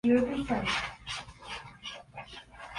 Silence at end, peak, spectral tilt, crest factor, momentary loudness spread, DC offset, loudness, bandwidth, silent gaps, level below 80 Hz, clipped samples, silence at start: 0 s; -14 dBFS; -4.5 dB/octave; 18 dB; 18 LU; under 0.1%; -33 LUFS; 11.5 kHz; none; -54 dBFS; under 0.1%; 0.05 s